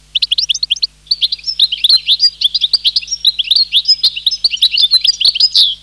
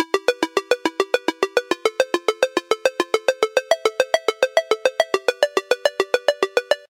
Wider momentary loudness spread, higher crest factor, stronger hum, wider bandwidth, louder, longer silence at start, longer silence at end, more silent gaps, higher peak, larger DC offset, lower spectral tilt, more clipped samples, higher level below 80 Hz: first, 6 LU vs 2 LU; second, 12 dB vs 20 dB; neither; second, 13.5 kHz vs 17 kHz; first, -10 LUFS vs -21 LUFS; first, 0.15 s vs 0 s; about the same, 0.1 s vs 0.15 s; neither; about the same, -2 dBFS vs 0 dBFS; neither; second, 3 dB/octave vs -1 dB/octave; neither; first, -48 dBFS vs -70 dBFS